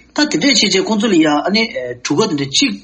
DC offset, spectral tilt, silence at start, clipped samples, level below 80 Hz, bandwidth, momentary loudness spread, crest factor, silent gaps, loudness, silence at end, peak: under 0.1%; -3 dB/octave; 0.15 s; under 0.1%; -54 dBFS; 8.8 kHz; 7 LU; 14 dB; none; -14 LUFS; 0.05 s; 0 dBFS